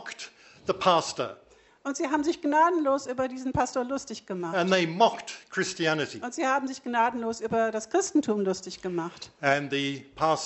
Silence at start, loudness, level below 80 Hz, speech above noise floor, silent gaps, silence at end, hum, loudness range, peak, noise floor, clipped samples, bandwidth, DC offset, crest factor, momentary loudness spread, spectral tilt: 0 s; -27 LUFS; -62 dBFS; 19 dB; none; 0 s; none; 2 LU; -8 dBFS; -46 dBFS; under 0.1%; 8.2 kHz; under 0.1%; 20 dB; 11 LU; -4 dB/octave